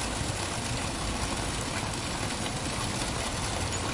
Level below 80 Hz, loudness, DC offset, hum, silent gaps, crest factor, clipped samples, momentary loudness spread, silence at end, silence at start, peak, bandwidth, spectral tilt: -42 dBFS; -31 LUFS; under 0.1%; none; none; 14 dB; under 0.1%; 1 LU; 0 s; 0 s; -16 dBFS; 11.5 kHz; -3.5 dB/octave